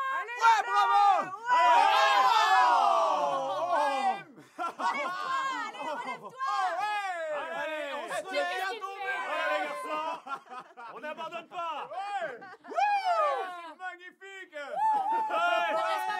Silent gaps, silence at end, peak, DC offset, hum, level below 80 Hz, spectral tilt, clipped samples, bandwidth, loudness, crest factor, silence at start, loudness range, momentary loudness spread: none; 0 s; -12 dBFS; under 0.1%; none; under -90 dBFS; -1 dB/octave; under 0.1%; 15.5 kHz; -28 LUFS; 18 dB; 0 s; 11 LU; 18 LU